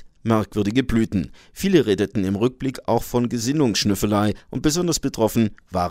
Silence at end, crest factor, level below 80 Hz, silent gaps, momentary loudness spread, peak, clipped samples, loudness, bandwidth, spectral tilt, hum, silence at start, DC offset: 0 s; 18 dB; -42 dBFS; none; 5 LU; -2 dBFS; under 0.1%; -21 LUFS; 16 kHz; -5.5 dB/octave; none; 0 s; under 0.1%